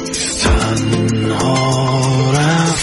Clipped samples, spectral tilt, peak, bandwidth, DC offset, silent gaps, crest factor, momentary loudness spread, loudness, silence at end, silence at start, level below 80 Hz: under 0.1%; -4.5 dB/octave; 0 dBFS; 11.5 kHz; under 0.1%; none; 14 dB; 3 LU; -14 LUFS; 0 s; 0 s; -26 dBFS